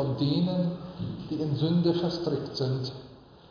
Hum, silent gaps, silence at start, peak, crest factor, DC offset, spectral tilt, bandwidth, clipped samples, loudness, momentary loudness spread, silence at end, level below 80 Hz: none; none; 0 s; -14 dBFS; 16 dB; under 0.1%; -8.5 dB/octave; 5.2 kHz; under 0.1%; -29 LUFS; 12 LU; 0.25 s; -58 dBFS